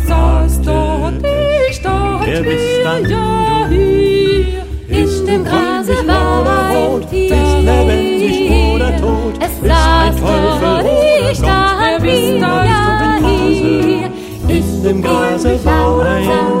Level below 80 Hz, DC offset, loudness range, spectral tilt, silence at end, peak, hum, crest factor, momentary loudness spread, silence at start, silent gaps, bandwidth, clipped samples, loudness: -18 dBFS; under 0.1%; 2 LU; -6 dB/octave; 0 s; 0 dBFS; none; 12 dB; 4 LU; 0 s; none; 16 kHz; under 0.1%; -13 LUFS